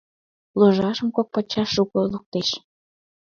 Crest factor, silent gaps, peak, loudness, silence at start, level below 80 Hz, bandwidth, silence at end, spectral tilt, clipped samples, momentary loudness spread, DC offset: 20 dB; 2.26-2.32 s; -4 dBFS; -22 LUFS; 0.55 s; -58 dBFS; 7 kHz; 0.75 s; -6 dB/octave; under 0.1%; 8 LU; under 0.1%